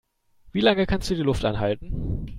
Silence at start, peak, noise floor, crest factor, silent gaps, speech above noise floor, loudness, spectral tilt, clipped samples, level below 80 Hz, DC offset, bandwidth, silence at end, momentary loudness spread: 0.45 s; -6 dBFS; -55 dBFS; 18 dB; none; 32 dB; -24 LUFS; -6 dB/octave; under 0.1%; -36 dBFS; under 0.1%; 13 kHz; 0 s; 10 LU